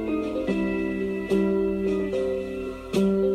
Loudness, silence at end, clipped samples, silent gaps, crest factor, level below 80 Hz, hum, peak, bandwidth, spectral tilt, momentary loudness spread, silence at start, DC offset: -26 LUFS; 0 s; under 0.1%; none; 14 dB; -46 dBFS; none; -12 dBFS; 13.5 kHz; -7.5 dB/octave; 6 LU; 0 s; under 0.1%